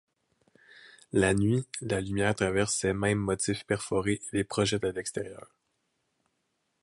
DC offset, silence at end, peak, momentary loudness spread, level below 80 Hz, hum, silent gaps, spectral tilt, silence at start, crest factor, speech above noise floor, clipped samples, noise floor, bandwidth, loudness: under 0.1%; 1.45 s; -10 dBFS; 7 LU; -52 dBFS; none; none; -4.5 dB/octave; 0.85 s; 20 dB; 49 dB; under 0.1%; -78 dBFS; 11.5 kHz; -29 LUFS